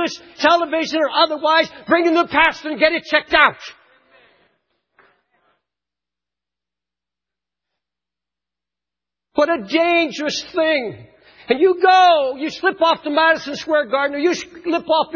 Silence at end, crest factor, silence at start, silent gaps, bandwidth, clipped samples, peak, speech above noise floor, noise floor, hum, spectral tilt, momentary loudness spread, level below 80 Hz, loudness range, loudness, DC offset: 0 s; 20 dB; 0 s; none; 7.2 kHz; under 0.1%; 0 dBFS; 71 dB; -88 dBFS; none; -3 dB/octave; 9 LU; -56 dBFS; 7 LU; -17 LUFS; under 0.1%